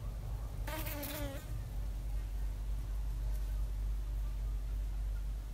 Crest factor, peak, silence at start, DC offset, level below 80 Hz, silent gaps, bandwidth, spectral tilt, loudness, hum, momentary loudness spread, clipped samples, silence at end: 12 dB; -26 dBFS; 0 s; under 0.1%; -38 dBFS; none; 16 kHz; -5.5 dB/octave; -42 LUFS; none; 3 LU; under 0.1%; 0 s